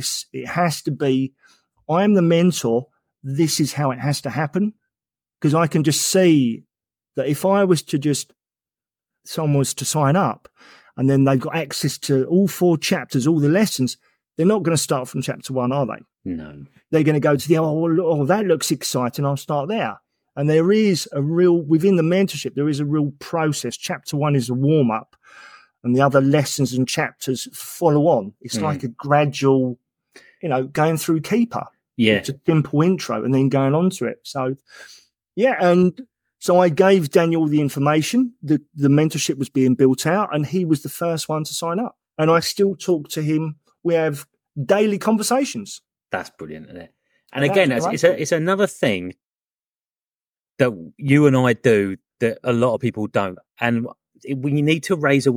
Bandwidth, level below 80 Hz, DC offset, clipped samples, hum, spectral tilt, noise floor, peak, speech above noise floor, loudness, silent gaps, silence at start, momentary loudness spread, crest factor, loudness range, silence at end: 18 kHz; -64 dBFS; under 0.1%; under 0.1%; none; -5.5 dB/octave; under -90 dBFS; 0 dBFS; over 71 dB; -19 LUFS; 49.38-49.42 s, 49.55-49.59 s, 50.28-50.33 s; 0 s; 12 LU; 20 dB; 3 LU; 0 s